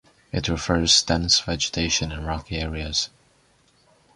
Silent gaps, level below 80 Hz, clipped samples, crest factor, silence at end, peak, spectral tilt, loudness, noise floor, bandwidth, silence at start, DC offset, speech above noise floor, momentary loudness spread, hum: none; -38 dBFS; under 0.1%; 22 dB; 1.1 s; -4 dBFS; -3 dB/octave; -22 LUFS; -61 dBFS; 11.5 kHz; 0.35 s; under 0.1%; 37 dB; 12 LU; none